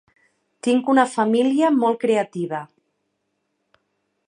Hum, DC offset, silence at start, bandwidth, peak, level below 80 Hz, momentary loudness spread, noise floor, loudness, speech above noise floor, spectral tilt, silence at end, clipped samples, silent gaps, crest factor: none; under 0.1%; 0.65 s; 11 kHz; -2 dBFS; -76 dBFS; 10 LU; -74 dBFS; -20 LUFS; 55 dB; -5.5 dB/octave; 1.65 s; under 0.1%; none; 20 dB